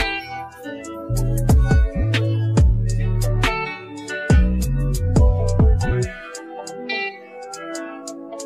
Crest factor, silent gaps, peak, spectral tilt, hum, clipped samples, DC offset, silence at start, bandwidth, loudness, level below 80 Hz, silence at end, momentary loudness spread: 14 dB; none; -4 dBFS; -6 dB/octave; none; under 0.1%; under 0.1%; 0 s; 15 kHz; -20 LUFS; -22 dBFS; 0 s; 16 LU